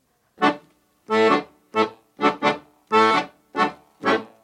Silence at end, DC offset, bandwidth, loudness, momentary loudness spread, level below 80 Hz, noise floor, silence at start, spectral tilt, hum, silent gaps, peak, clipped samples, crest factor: 0.2 s; under 0.1%; 11 kHz; -22 LUFS; 9 LU; -68 dBFS; -57 dBFS; 0.4 s; -4.5 dB/octave; none; none; -4 dBFS; under 0.1%; 18 dB